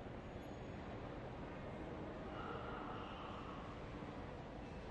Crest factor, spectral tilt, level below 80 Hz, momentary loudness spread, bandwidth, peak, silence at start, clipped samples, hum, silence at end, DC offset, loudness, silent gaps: 14 dB; -7 dB/octave; -60 dBFS; 4 LU; 10 kHz; -34 dBFS; 0 s; under 0.1%; none; 0 s; under 0.1%; -50 LUFS; none